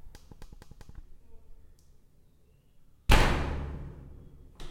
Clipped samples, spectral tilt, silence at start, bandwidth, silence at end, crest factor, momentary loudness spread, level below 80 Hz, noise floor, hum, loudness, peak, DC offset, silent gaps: under 0.1%; -5 dB/octave; 0.05 s; 16.5 kHz; 0 s; 26 dB; 29 LU; -34 dBFS; -61 dBFS; none; -29 LUFS; -6 dBFS; under 0.1%; none